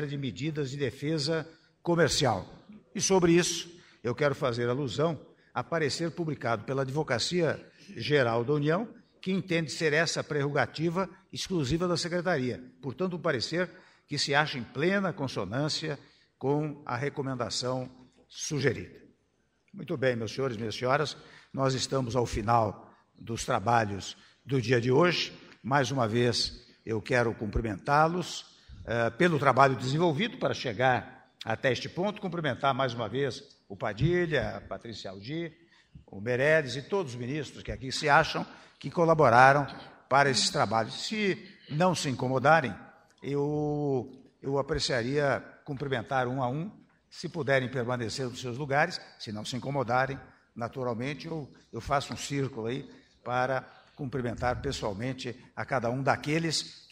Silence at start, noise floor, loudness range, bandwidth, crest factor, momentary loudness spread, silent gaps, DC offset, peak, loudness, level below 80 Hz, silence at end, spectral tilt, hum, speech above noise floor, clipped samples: 0 s; -72 dBFS; 7 LU; 15.5 kHz; 24 dB; 15 LU; none; under 0.1%; -4 dBFS; -29 LUFS; -54 dBFS; 0.15 s; -5 dB/octave; none; 43 dB; under 0.1%